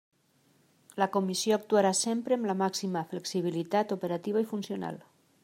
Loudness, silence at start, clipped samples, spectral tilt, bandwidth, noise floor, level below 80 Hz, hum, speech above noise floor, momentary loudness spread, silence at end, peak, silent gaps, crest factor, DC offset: -30 LUFS; 0.95 s; under 0.1%; -4.5 dB/octave; 16 kHz; -67 dBFS; -80 dBFS; none; 38 dB; 10 LU; 0.45 s; -12 dBFS; none; 20 dB; under 0.1%